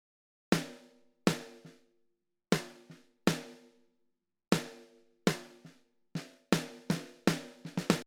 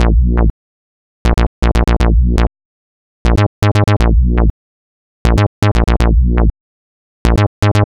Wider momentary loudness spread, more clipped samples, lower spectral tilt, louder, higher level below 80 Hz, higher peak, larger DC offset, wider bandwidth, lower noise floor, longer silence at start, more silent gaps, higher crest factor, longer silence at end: first, 19 LU vs 6 LU; neither; second, -5 dB/octave vs -7 dB/octave; second, -35 LUFS vs -14 LUFS; second, -68 dBFS vs -14 dBFS; second, -10 dBFS vs 0 dBFS; neither; first, 19.5 kHz vs 10.5 kHz; second, -79 dBFS vs under -90 dBFS; first, 0.5 s vs 0 s; second, none vs 0.50-1.25 s, 1.47-1.62 s, 2.65-3.25 s, 3.47-3.62 s, 4.50-5.25 s, 5.47-5.62 s, 6.60-7.25 s, 7.47-7.62 s; first, 26 dB vs 12 dB; about the same, 0.05 s vs 0.15 s